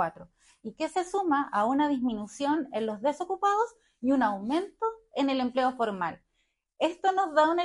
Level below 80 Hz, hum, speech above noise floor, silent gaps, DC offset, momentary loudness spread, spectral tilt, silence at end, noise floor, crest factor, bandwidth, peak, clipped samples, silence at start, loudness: -68 dBFS; none; 49 dB; none; under 0.1%; 8 LU; -5 dB/octave; 0 s; -77 dBFS; 16 dB; 11.5 kHz; -12 dBFS; under 0.1%; 0 s; -29 LUFS